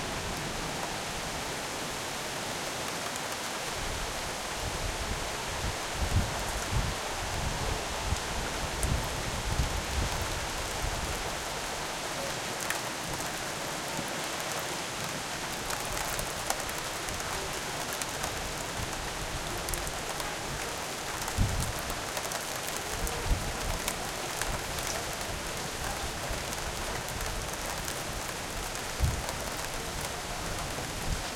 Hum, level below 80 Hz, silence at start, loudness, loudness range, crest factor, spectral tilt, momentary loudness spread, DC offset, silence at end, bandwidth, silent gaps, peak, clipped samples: none; -42 dBFS; 0 s; -33 LUFS; 2 LU; 24 dB; -3 dB/octave; 3 LU; under 0.1%; 0 s; 17 kHz; none; -10 dBFS; under 0.1%